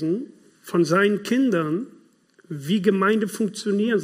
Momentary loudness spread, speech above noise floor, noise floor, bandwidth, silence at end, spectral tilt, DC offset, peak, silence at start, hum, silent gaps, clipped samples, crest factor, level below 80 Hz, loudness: 14 LU; 35 dB; -57 dBFS; 15.5 kHz; 0 s; -6 dB/octave; under 0.1%; -6 dBFS; 0 s; none; none; under 0.1%; 18 dB; -74 dBFS; -22 LUFS